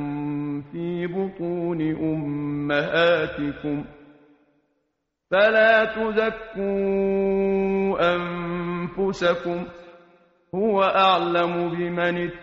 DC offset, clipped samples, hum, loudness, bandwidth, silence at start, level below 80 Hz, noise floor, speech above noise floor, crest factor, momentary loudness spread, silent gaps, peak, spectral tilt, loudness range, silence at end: under 0.1%; under 0.1%; none; -23 LUFS; 7.4 kHz; 0 s; -54 dBFS; -76 dBFS; 55 dB; 18 dB; 11 LU; none; -6 dBFS; -4 dB/octave; 4 LU; 0 s